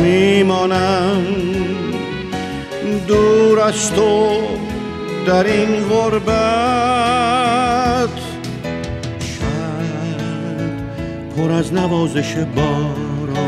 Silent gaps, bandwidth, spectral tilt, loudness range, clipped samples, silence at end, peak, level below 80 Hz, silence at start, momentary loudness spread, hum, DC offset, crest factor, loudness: none; 14 kHz; -5.5 dB/octave; 6 LU; under 0.1%; 0 s; -2 dBFS; -38 dBFS; 0 s; 11 LU; none; under 0.1%; 14 dB; -17 LUFS